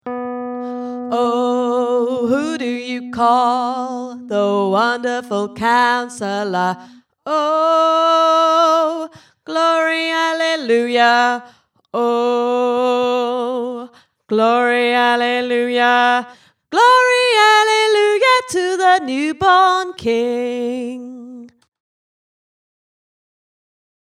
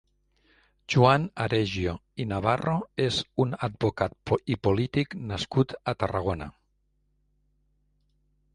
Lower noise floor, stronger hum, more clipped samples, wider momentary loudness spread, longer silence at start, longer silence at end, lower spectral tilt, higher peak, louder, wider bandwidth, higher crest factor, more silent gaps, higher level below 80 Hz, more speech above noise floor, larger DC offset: second, -38 dBFS vs -71 dBFS; second, none vs 50 Hz at -50 dBFS; neither; first, 13 LU vs 10 LU; second, 0.05 s vs 0.9 s; first, 2.6 s vs 2.05 s; second, -3.5 dB/octave vs -6.5 dB/octave; first, 0 dBFS vs -6 dBFS; first, -16 LUFS vs -27 LUFS; first, 14 kHz vs 11 kHz; second, 16 dB vs 24 dB; neither; second, -62 dBFS vs -48 dBFS; second, 22 dB vs 45 dB; neither